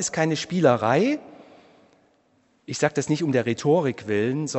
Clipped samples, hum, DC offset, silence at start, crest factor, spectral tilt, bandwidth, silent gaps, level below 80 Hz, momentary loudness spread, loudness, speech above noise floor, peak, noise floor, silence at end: under 0.1%; none; under 0.1%; 0 s; 20 dB; -5 dB/octave; 8.4 kHz; none; -66 dBFS; 5 LU; -23 LUFS; 41 dB; -4 dBFS; -64 dBFS; 0 s